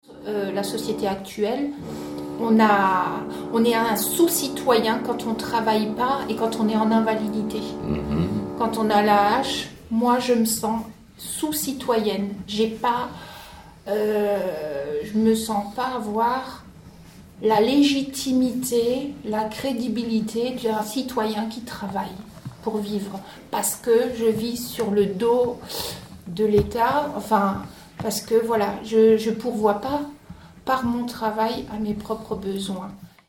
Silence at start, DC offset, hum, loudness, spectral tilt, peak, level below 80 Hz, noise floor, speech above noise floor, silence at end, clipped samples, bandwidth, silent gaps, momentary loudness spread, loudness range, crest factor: 0.1 s; under 0.1%; none; -23 LUFS; -4.5 dB/octave; -4 dBFS; -50 dBFS; -45 dBFS; 23 dB; 0.2 s; under 0.1%; 17.5 kHz; none; 12 LU; 5 LU; 18 dB